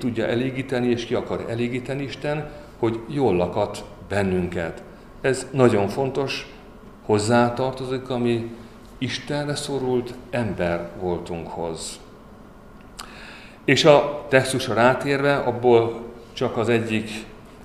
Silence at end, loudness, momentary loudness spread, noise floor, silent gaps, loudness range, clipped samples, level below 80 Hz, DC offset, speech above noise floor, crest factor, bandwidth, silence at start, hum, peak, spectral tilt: 0 s; -23 LUFS; 18 LU; -44 dBFS; none; 8 LU; under 0.1%; -48 dBFS; 0.1%; 23 dB; 24 dB; 14 kHz; 0 s; none; 0 dBFS; -5.5 dB/octave